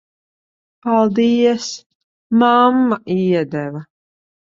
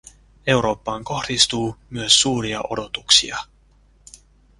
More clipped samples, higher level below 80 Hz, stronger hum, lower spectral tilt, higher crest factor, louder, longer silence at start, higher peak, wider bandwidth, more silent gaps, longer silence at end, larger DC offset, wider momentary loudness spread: neither; second, -62 dBFS vs -48 dBFS; neither; first, -6 dB/octave vs -2 dB/octave; second, 16 dB vs 22 dB; first, -16 LUFS vs -19 LUFS; first, 0.85 s vs 0.45 s; about the same, -2 dBFS vs 0 dBFS; second, 7.6 kHz vs 11.5 kHz; first, 1.86-2.30 s vs none; second, 0.75 s vs 1.15 s; neither; about the same, 15 LU vs 13 LU